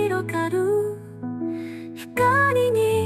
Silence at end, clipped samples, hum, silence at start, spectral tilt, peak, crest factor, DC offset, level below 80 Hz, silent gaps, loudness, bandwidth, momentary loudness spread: 0 s; under 0.1%; none; 0 s; -6 dB/octave; -8 dBFS; 14 dB; under 0.1%; -60 dBFS; none; -22 LUFS; 15.5 kHz; 15 LU